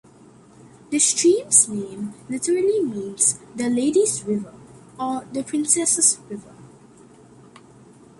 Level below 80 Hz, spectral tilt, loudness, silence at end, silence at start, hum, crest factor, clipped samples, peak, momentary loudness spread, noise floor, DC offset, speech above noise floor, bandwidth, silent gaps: -64 dBFS; -2.5 dB/octave; -20 LUFS; 1.55 s; 0.9 s; none; 22 dB; under 0.1%; -2 dBFS; 15 LU; -49 dBFS; under 0.1%; 28 dB; 11.5 kHz; none